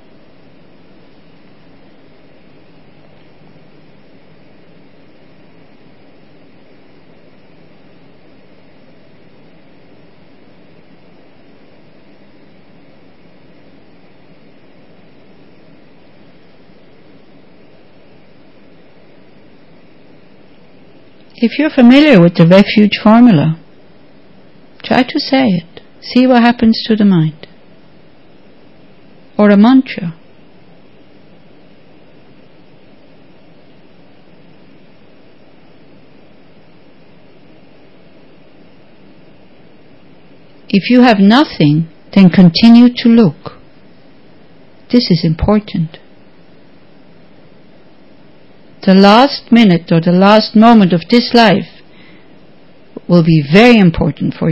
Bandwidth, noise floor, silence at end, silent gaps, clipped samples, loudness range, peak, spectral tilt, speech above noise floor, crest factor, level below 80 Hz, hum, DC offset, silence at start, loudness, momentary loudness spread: 8 kHz; -44 dBFS; 0 s; none; 0.5%; 9 LU; 0 dBFS; -8 dB/octave; 36 dB; 14 dB; -42 dBFS; none; 1%; 21.4 s; -9 LUFS; 13 LU